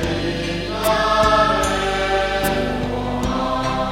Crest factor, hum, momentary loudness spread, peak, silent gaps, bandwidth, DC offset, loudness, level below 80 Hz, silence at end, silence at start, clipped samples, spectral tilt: 16 dB; none; 8 LU; -2 dBFS; none; 16.5 kHz; under 0.1%; -19 LUFS; -32 dBFS; 0 s; 0 s; under 0.1%; -4.5 dB/octave